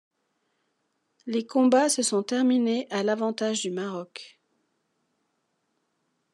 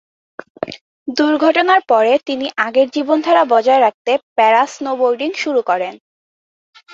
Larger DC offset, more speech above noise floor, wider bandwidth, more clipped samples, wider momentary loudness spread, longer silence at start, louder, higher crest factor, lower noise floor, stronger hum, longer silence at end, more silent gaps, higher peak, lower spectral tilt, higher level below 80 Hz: neither; second, 51 dB vs over 76 dB; first, 12 kHz vs 7.8 kHz; neither; about the same, 15 LU vs 13 LU; first, 1.25 s vs 0.6 s; second, -25 LUFS vs -15 LUFS; about the same, 18 dB vs 14 dB; second, -76 dBFS vs under -90 dBFS; neither; first, 2.05 s vs 0.95 s; second, none vs 0.81-1.06 s, 3.94-4.05 s, 4.23-4.36 s; second, -10 dBFS vs 0 dBFS; about the same, -3.5 dB/octave vs -3.5 dB/octave; second, -90 dBFS vs -66 dBFS